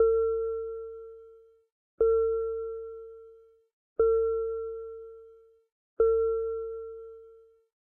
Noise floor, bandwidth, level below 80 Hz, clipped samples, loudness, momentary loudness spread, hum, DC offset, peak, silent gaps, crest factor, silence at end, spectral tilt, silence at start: -56 dBFS; 1.6 kHz; -56 dBFS; under 0.1%; -29 LUFS; 23 LU; none; under 0.1%; -14 dBFS; 1.72-1.98 s, 3.73-3.96 s, 5.72-5.97 s; 16 dB; 0.65 s; -10.5 dB/octave; 0 s